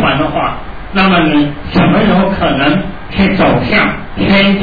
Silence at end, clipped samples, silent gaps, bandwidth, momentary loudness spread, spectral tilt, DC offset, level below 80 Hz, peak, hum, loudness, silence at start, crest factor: 0 s; under 0.1%; none; 5 kHz; 8 LU; -8.5 dB/octave; 4%; -28 dBFS; 0 dBFS; none; -11 LUFS; 0 s; 10 dB